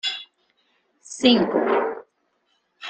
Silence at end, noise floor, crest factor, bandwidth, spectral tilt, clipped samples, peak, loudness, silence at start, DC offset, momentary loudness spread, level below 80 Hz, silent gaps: 0 s; -70 dBFS; 20 dB; 9.2 kHz; -4 dB/octave; under 0.1%; -4 dBFS; -20 LUFS; 0.05 s; under 0.1%; 20 LU; -66 dBFS; none